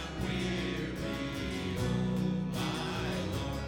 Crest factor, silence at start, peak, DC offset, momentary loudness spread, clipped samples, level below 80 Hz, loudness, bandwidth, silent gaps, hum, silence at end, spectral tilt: 12 dB; 0 s; -20 dBFS; under 0.1%; 4 LU; under 0.1%; -46 dBFS; -34 LUFS; 17.5 kHz; none; none; 0 s; -6 dB/octave